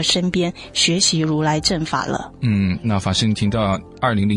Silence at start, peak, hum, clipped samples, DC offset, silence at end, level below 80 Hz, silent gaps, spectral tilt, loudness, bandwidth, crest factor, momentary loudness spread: 0 s; -4 dBFS; none; under 0.1%; under 0.1%; 0 s; -44 dBFS; none; -4 dB/octave; -19 LUFS; 11.5 kHz; 16 dB; 6 LU